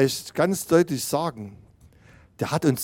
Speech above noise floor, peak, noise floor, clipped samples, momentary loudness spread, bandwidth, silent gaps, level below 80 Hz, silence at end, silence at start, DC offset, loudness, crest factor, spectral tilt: 30 dB; -6 dBFS; -53 dBFS; under 0.1%; 13 LU; 17 kHz; none; -58 dBFS; 0 s; 0 s; under 0.1%; -24 LUFS; 18 dB; -5 dB/octave